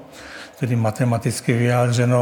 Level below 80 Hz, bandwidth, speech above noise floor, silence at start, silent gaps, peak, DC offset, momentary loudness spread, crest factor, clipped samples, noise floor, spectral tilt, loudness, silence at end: -60 dBFS; 18 kHz; 20 dB; 0 s; none; -4 dBFS; under 0.1%; 18 LU; 16 dB; under 0.1%; -38 dBFS; -6.5 dB/octave; -20 LUFS; 0 s